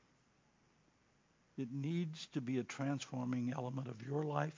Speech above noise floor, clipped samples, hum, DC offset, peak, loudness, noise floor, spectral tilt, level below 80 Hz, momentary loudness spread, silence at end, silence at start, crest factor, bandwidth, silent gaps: 34 dB; under 0.1%; none; under 0.1%; -20 dBFS; -41 LUFS; -74 dBFS; -6.5 dB/octave; -84 dBFS; 6 LU; 0 s; 1.55 s; 22 dB; 7.6 kHz; none